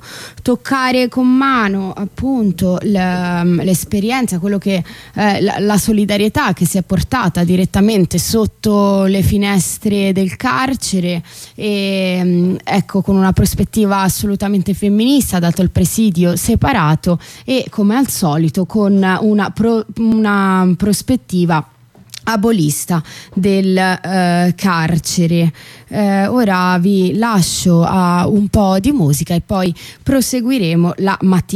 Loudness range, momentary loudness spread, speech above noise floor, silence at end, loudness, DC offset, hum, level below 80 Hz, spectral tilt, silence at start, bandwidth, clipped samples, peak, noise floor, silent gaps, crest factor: 2 LU; 5 LU; 23 dB; 0 s; -14 LUFS; under 0.1%; none; -36 dBFS; -5.5 dB/octave; 0.05 s; 16 kHz; under 0.1%; -2 dBFS; -37 dBFS; none; 10 dB